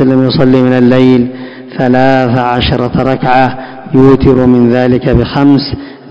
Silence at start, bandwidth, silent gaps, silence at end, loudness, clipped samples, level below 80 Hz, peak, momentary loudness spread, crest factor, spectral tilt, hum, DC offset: 0 s; 6.4 kHz; none; 0 s; -8 LUFS; 5%; -28 dBFS; 0 dBFS; 9 LU; 8 dB; -8.5 dB/octave; none; 1%